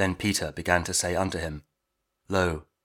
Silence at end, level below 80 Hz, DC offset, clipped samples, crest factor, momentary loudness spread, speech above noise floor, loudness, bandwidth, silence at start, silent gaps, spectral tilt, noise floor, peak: 0.2 s; -48 dBFS; under 0.1%; under 0.1%; 24 dB; 10 LU; 53 dB; -27 LUFS; 19.5 kHz; 0 s; none; -3.5 dB/octave; -80 dBFS; -4 dBFS